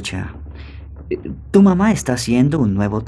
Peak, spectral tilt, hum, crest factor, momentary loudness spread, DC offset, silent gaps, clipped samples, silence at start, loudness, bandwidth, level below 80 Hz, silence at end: 0 dBFS; -6.5 dB/octave; none; 16 dB; 22 LU; under 0.1%; none; under 0.1%; 0 s; -16 LUFS; 12.5 kHz; -36 dBFS; 0 s